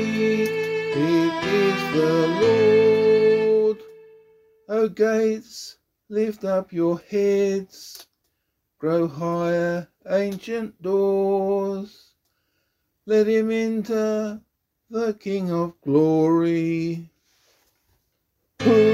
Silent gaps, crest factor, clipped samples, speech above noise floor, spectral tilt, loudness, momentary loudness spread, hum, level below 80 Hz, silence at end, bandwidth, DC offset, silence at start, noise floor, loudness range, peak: none; 16 dB; under 0.1%; 54 dB; -6.5 dB/octave; -22 LUFS; 13 LU; none; -64 dBFS; 0 s; 15 kHz; under 0.1%; 0 s; -75 dBFS; 6 LU; -6 dBFS